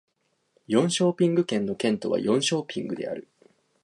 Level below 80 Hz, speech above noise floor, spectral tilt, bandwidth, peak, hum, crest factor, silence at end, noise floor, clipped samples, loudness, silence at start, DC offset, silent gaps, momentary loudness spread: -70 dBFS; 46 dB; -5 dB/octave; 11.5 kHz; -8 dBFS; none; 18 dB; 0.6 s; -70 dBFS; under 0.1%; -25 LUFS; 0.7 s; under 0.1%; none; 10 LU